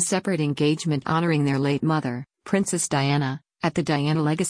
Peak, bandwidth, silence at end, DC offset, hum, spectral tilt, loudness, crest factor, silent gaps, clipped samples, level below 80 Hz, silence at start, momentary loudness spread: -8 dBFS; 10.5 kHz; 0 s; under 0.1%; none; -5 dB/octave; -23 LUFS; 14 dB; none; under 0.1%; -60 dBFS; 0 s; 5 LU